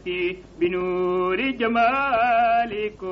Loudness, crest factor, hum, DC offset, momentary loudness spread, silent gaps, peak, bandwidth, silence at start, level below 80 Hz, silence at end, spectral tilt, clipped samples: -22 LUFS; 12 dB; none; under 0.1%; 8 LU; none; -10 dBFS; 6.2 kHz; 0.05 s; -50 dBFS; 0 s; -3 dB/octave; under 0.1%